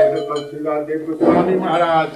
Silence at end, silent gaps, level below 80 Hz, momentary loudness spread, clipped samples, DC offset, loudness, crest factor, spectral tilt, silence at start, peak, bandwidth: 0 s; none; -56 dBFS; 9 LU; under 0.1%; under 0.1%; -18 LUFS; 16 dB; -7 dB/octave; 0 s; -2 dBFS; 11.5 kHz